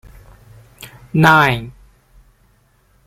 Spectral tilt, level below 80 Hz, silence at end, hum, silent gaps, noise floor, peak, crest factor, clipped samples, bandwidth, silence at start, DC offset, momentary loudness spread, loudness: -6 dB/octave; -44 dBFS; 1.35 s; none; none; -56 dBFS; 0 dBFS; 20 dB; under 0.1%; 16 kHz; 0.85 s; under 0.1%; 28 LU; -13 LUFS